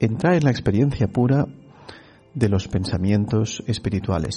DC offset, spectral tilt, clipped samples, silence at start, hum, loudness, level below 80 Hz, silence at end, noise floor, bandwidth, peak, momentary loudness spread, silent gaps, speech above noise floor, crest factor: under 0.1%; -7 dB/octave; under 0.1%; 0 s; none; -21 LUFS; -42 dBFS; 0 s; -45 dBFS; 11 kHz; -6 dBFS; 6 LU; none; 24 dB; 16 dB